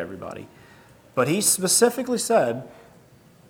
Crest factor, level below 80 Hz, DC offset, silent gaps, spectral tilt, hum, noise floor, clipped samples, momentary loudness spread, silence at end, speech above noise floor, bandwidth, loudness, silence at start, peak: 20 dB; -66 dBFS; under 0.1%; none; -3 dB/octave; none; -53 dBFS; under 0.1%; 19 LU; 0.8 s; 31 dB; over 20 kHz; -21 LUFS; 0 s; -6 dBFS